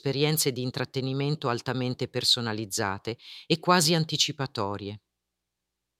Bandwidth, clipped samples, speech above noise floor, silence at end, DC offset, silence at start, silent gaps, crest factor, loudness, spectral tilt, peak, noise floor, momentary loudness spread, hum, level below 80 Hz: 16.5 kHz; under 0.1%; 57 dB; 1 s; under 0.1%; 0.05 s; none; 22 dB; -26 LUFS; -4 dB/octave; -6 dBFS; -85 dBFS; 13 LU; none; -68 dBFS